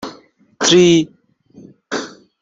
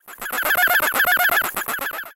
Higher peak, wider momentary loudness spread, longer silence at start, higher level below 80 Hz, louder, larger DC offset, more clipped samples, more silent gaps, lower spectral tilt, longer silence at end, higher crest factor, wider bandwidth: first, 0 dBFS vs -4 dBFS; first, 21 LU vs 9 LU; about the same, 0 s vs 0.05 s; about the same, -56 dBFS vs -54 dBFS; first, -14 LUFS vs -18 LUFS; neither; neither; neither; first, -4 dB/octave vs 0 dB/octave; first, 0.35 s vs 0 s; about the same, 16 dB vs 16 dB; second, 7.8 kHz vs 17 kHz